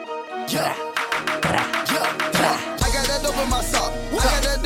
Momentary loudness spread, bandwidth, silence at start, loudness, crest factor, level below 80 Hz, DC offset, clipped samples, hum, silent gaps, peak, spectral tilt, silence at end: 5 LU; 17 kHz; 0 s; -22 LUFS; 18 dB; -30 dBFS; under 0.1%; under 0.1%; none; none; -4 dBFS; -3 dB/octave; 0 s